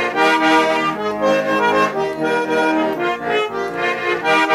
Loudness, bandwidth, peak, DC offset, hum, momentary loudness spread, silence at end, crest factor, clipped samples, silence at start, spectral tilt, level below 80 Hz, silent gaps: -17 LUFS; 15.5 kHz; -4 dBFS; under 0.1%; none; 6 LU; 0 s; 14 dB; under 0.1%; 0 s; -4 dB/octave; -56 dBFS; none